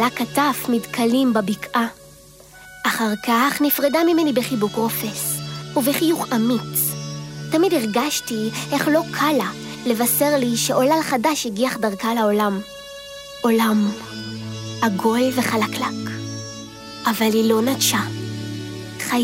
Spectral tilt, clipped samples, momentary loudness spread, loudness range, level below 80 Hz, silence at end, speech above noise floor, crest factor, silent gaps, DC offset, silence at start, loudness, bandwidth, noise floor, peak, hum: -4 dB/octave; under 0.1%; 13 LU; 3 LU; -58 dBFS; 0 s; 26 dB; 16 dB; none; under 0.1%; 0 s; -20 LUFS; 16 kHz; -45 dBFS; -4 dBFS; none